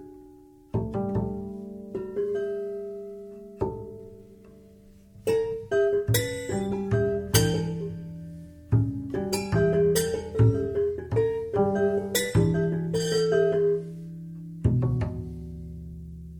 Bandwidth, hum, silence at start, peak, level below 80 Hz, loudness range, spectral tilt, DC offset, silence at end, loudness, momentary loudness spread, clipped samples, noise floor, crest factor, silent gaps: 19.5 kHz; none; 0 s; -4 dBFS; -46 dBFS; 9 LU; -6 dB/octave; under 0.1%; 0 s; -26 LUFS; 17 LU; under 0.1%; -52 dBFS; 22 dB; none